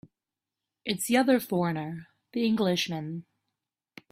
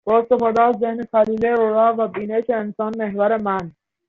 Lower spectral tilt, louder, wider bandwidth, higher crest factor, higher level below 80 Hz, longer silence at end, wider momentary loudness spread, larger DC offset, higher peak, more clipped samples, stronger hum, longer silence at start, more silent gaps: about the same, -5 dB/octave vs -5.5 dB/octave; second, -28 LUFS vs -19 LUFS; first, 16 kHz vs 6.8 kHz; first, 20 dB vs 14 dB; second, -70 dBFS vs -58 dBFS; first, 0.9 s vs 0.4 s; first, 15 LU vs 8 LU; neither; second, -10 dBFS vs -4 dBFS; neither; neither; first, 0.85 s vs 0.05 s; neither